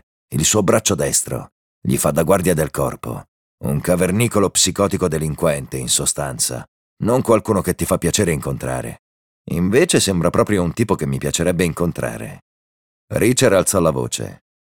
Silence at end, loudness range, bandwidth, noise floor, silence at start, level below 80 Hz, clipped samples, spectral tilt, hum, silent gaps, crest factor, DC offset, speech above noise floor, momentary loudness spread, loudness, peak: 0.4 s; 2 LU; 19 kHz; under -90 dBFS; 0.3 s; -40 dBFS; under 0.1%; -4.5 dB/octave; none; 1.52-1.82 s, 3.28-3.58 s, 6.68-6.97 s, 8.99-9.45 s, 12.42-13.08 s; 18 dB; under 0.1%; over 72 dB; 12 LU; -18 LUFS; -2 dBFS